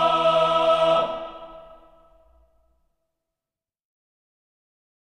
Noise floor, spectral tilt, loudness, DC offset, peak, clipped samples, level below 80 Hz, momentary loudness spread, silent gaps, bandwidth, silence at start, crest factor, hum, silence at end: under -90 dBFS; -4.5 dB/octave; -20 LUFS; under 0.1%; -8 dBFS; under 0.1%; -58 dBFS; 21 LU; none; 10 kHz; 0 s; 18 dB; none; 3.55 s